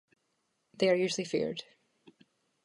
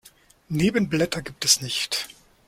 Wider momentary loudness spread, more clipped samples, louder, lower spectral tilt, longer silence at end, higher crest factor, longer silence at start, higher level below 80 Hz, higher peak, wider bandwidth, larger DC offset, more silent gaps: about the same, 9 LU vs 9 LU; neither; second, -31 LUFS vs -23 LUFS; first, -4.5 dB/octave vs -3 dB/octave; first, 1.05 s vs 0.4 s; about the same, 20 dB vs 22 dB; first, 0.8 s vs 0.05 s; second, -76 dBFS vs -54 dBFS; second, -14 dBFS vs -2 dBFS; second, 11.5 kHz vs 16.5 kHz; neither; neither